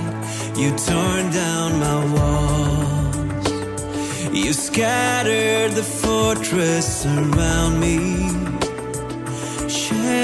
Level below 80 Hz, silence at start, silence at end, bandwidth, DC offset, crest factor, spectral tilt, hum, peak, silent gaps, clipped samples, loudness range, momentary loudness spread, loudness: -32 dBFS; 0 s; 0 s; 12 kHz; under 0.1%; 16 dB; -4.5 dB/octave; none; -4 dBFS; none; under 0.1%; 2 LU; 8 LU; -20 LUFS